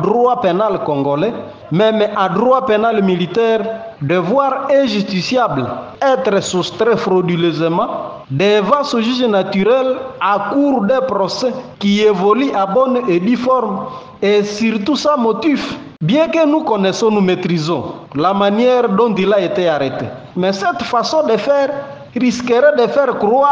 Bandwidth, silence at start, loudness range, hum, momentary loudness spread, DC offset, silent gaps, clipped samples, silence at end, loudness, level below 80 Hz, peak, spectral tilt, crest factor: 9.8 kHz; 0 s; 1 LU; none; 7 LU; under 0.1%; none; under 0.1%; 0 s; -15 LUFS; -56 dBFS; 0 dBFS; -6 dB/octave; 14 dB